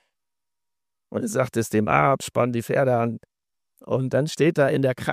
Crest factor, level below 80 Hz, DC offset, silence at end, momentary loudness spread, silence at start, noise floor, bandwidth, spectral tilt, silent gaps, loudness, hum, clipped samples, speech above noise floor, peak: 20 dB; -58 dBFS; under 0.1%; 0 s; 9 LU; 1.1 s; -88 dBFS; 15.5 kHz; -6 dB/octave; none; -22 LUFS; none; under 0.1%; 66 dB; -4 dBFS